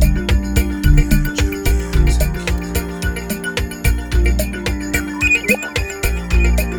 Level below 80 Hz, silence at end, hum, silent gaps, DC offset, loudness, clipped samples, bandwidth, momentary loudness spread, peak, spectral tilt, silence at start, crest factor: -18 dBFS; 0 s; none; none; under 0.1%; -18 LUFS; under 0.1%; over 20 kHz; 7 LU; 0 dBFS; -5 dB/octave; 0 s; 16 dB